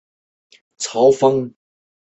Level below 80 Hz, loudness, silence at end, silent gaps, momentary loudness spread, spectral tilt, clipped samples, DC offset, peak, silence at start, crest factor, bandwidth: -62 dBFS; -17 LUFS; 0.7 s; none; 15 LU; -5 dB/octave; under 0.1%; under 0.1%; -2 dBFS; 0.8 s; 18 dB; 8.2 kHz